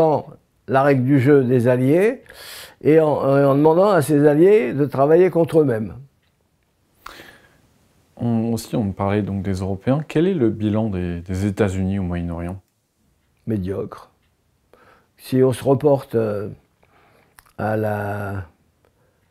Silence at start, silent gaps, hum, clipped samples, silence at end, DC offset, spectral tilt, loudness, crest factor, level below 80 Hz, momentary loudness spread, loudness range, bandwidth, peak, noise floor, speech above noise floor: 0 s; none; none; under 0.1%; 0.85 s; under 0.1%; -8 dB/octave; -19 LUFS; 16 dB; -50 dBFS; 15 LU; 11 LU; 15 kHz; -4 dBFS; -65 dBFS; 47 dB